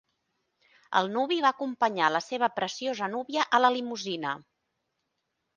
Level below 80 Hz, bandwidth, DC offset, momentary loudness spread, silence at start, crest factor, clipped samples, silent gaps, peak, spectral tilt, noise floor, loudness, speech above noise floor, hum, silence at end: -80 dBFS; 9.6 kHz; under 0.1%; 9 LU; 0.9 s; 22 dB; under 0.1%; none; -6 dBFS; -3.5 dB/octave; -81 dBFS; -28 LUFS; 53 dB; none; 1.15 s